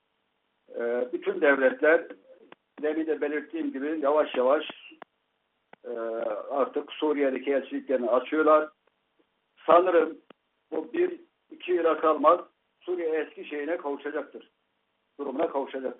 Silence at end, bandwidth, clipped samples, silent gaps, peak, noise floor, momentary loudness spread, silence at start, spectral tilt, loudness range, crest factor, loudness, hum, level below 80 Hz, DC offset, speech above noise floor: 0.05 s; 4 kHz; under 0.1%; none; -6 dBFS; -76 dBFS; 15 LU; 0.7 s; -1.5 dB/octave; 5 LU; 20 dB; -27 LUFS; none; -80 dBFS; under 0.1%; 50 dB